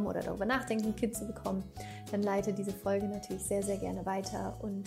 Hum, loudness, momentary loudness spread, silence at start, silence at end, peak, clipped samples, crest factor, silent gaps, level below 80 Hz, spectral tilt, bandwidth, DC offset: none; -35 LUFS; 6 LU; 0 s; 0 s; -18 dBFS; under 0.1%; 16 dB; none; -54 dBFS; -5.5 dB/octave; 16 kHz; under 0.1%